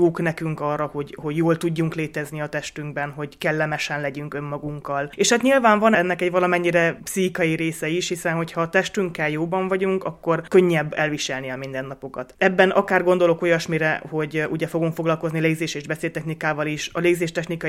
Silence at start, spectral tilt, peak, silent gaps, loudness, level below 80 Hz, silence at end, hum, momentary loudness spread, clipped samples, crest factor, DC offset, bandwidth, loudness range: 0 s; -5 dB/octave; -2 dBFS; none; -22 LUFS; -56 dBFS; 0 s; none; 11 LU; under 0.1%; 20 dB; under 0.1%; 16 kHz; 5 LU